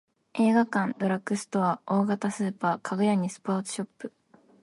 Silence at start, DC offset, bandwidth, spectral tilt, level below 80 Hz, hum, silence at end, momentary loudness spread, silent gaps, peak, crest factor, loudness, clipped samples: 0.35 s; under 0.1%; 11.5 kHz; -6 dB/octave; -74 dBFS; none; 0.55 s; 12 LU; none; -10 dBFS; 16 dB; -27 LUFS; under 0.1%